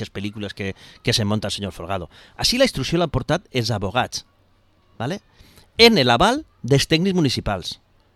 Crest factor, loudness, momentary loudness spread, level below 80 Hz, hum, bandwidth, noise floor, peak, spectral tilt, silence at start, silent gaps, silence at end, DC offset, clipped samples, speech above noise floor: 22 dB; -20 LUFS; 16 LU; -42 dBFS; none; 15.5 kHz; -58 dBFS; 0 dBFS; -4.5 dB/octave; 0 s; none; 0.4 s; under 0.1%; under 0.1%; 38 dB